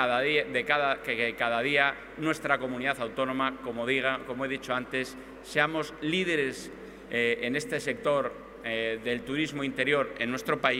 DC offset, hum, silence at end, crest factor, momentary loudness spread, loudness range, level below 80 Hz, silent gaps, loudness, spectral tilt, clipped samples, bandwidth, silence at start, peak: under 0.1%; none; 0 s; 22 dB; 8 LU; 3 LU; -60 dBFS; none; -29 LUFS; -4.5 dB/octave; under 0.1%; 16 kHz; 0 s; -8 dBFS